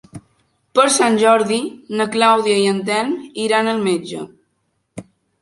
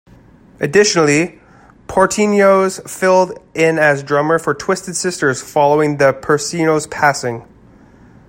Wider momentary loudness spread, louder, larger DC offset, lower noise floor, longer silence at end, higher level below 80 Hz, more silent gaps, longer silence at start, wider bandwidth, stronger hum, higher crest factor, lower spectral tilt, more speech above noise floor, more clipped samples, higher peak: first, 18 LU vs 8 LU; about the same, -16 LUFS vs -14 LUFS; neither; first, -68 dBFS vs -45 dBFS; second, 0.4 s vs 0.85 s; second, -64 dBFS vs -50 dBFS; neither; second, 0.15 s vs 0.6 s; second, 11.5 kHz vs 16.5 kHz; neither; about the same, 16 dB vs 16 dB; about the same, -3.5 dB/octave vs -4.5 dB/octave; first, 52 dB vs 31 dB; neither; about the same, -2 dBFS vs 0 dBFS